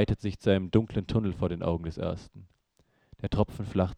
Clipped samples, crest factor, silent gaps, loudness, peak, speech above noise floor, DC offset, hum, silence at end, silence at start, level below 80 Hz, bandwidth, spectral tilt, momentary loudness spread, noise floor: under 0.1%; 22 dB; none; -30 LUFS; -8 dBFS; 41 dB; under 0.1%; none; 0.05 s; 0 s; -46 dBFS; 9.8 kHz; -8.5 dB/octave; 9 LU; -70 dBFS